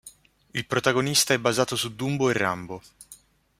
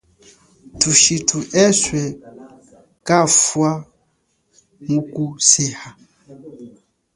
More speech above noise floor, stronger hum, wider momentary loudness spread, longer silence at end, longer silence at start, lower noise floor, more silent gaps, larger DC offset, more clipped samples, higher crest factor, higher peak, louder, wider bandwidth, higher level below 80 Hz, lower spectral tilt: second, 28 dB vs 49 dB; neither; second, 13 LU vs 17 LU; about the same, 0.45 s vs 0.5 s; second, 0.05 s vs 0.75 s; second, -53 dBFS vs -66 dBFS; neither; neither; neither; about the same, 22 dB vs 20 dB; second, -4 dBFS vs 0 dBFS; second, -24 LUFS vs -15 LUFS; first, 16 kHz vs 11.5 kHz; second, -62 dBFS vs -52 dBFS; about the same, -3.5 dB/octave vs -3 dB/octave